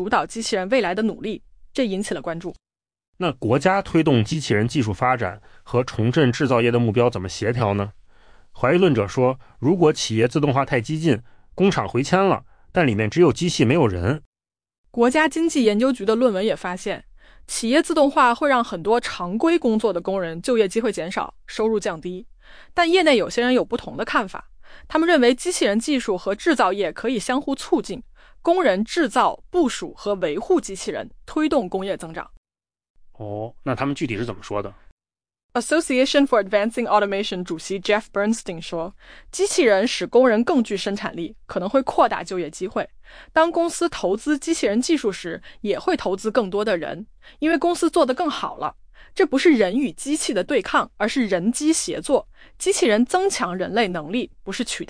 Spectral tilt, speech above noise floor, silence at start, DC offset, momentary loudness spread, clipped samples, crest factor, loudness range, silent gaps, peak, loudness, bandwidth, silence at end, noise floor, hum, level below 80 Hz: -5 dB/octave; 28 dB; 0 s; under 0.1%; 12 LU; under 0.1%; 16 dB; 4 LU; 3.08-3.13 s, 14.26-14.33 s, 14.78-14.84 s, 32.37-32.43 s, 32.90-32.94 s, 34.92-34.97 s, 35.44-35.49 s; -4 dBFS; -21 LUFS; 10.5 kHz; 0.05 s; -48 dBFS; none; -50 dBFS